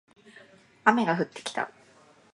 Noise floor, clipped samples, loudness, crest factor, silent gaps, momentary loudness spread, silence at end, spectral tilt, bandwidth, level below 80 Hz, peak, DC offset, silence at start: -58 dBFS; under 0.1%; -27 LUFS; 26 dB; none; 11 LU; 0.65 s; -5 dB/octave; 11.5 kHz; -78 dBFS; -4 dBFS; under 0.1%; 0.85 s